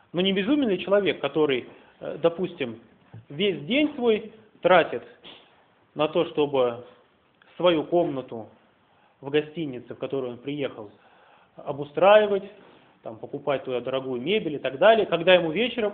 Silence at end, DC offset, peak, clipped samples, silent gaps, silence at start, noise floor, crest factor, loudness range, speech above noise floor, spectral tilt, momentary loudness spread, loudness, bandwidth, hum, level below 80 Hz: 0 s; under 0.1%; -4 dBFS; under 0.1%; none; 0.15 s; -61 dBFS; 22 dB; 5 LU; 37 dB; -9.5 dB/octave; 20 LU; -24 LUFS; 4.4 kHz; none; -66 dBFS